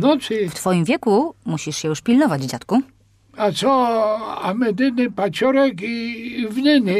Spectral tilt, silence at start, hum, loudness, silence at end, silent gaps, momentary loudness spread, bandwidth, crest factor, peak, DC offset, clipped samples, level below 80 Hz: -5.5 dB/octave; 0 s; none; -19 LUFS; 0 s; none; 8 LU; 14.5 kHz; 12 dB; -6 dBFS; under 0.1%; under 0.1%; -60 dBFS